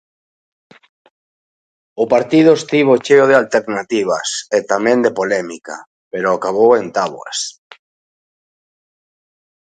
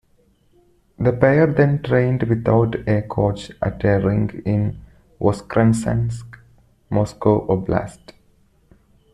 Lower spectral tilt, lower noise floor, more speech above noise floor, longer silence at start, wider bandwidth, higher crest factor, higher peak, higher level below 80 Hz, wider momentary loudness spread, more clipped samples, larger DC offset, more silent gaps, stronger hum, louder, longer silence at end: second, -4.5 dB/octave vs -8 dB/octave; first, under -90 dBFS vs -58 dBFS; first, over 76 dB vs 40 dB; first, 1.95 s vs 1 s; second, 9.4 kHz vs 11.5 kHz; about the same, 16 dB vs 18 dB; about the same, 0 dBFS vs -2 dBFS; second, -64 dBFS vs -42 dBFS; first, 15 LU vs 9 LU; neither; neither; first, 5.87-6.11 s vs none; neither; first, -14 LUFS vs -19 LUFS; first, 2.2 s vs 1.2 s